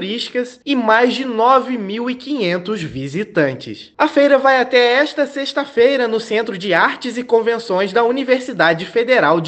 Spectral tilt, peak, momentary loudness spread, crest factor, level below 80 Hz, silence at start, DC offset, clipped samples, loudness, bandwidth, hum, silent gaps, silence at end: -5 dB/octave; 0 dBFS; 10 LU; 16 dB; -60 dBFS; 0 s; under 0.1%; under 0.1%; -16 LUFS; 8.6 kHz; none; none; 0 s